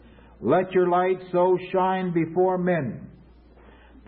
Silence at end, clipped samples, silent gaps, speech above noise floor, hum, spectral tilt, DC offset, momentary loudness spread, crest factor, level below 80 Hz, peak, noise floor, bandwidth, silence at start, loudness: 0.95 s; under 0.1%; none; 28 dB; none; -12 dB/octave; under 0.1%; 7 LU; 16 dB; -56 dBFS; -8 dBFS; -51 dBFS; 4.3 kHz; 0.4 s; -23 LUFS